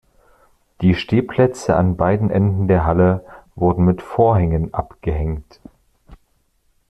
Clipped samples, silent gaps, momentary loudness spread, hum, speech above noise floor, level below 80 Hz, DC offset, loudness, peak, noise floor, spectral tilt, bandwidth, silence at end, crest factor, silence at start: under 0.1%; none; 9 LU; none; 46 dB; -36 dBFS; under 0.1%; -18 LUFS; -2 dBFS; -62 dBFS; -8.5 dB/octave; 9.2 kHz; 0.75 s; 16 dB; 0.8 s